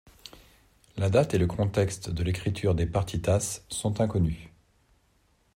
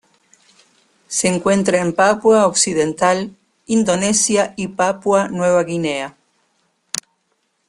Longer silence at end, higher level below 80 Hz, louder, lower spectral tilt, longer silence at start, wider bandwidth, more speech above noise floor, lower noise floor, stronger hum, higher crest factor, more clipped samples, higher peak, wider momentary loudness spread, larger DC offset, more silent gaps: first, 1.05 s vs 0.7 s; first, -46 dBFS vs -56 dBFS; second, -28 LUFS vs -17 LUFS; first, -6 dB/octave vs -3.5 dB/octave; second, 0.25 s vs 1.1 s; first, 15.5 kHz vs 12.5 kHz; second, 40 dB vs 51 dB; about the same, -67 dBFS vs -67 dBFS; neither; about the same, 20 dB vs 18 dB; neither; second, -10 dBFS vs 0 dBFS; first, 16 LU vs 13 LU; neither; neither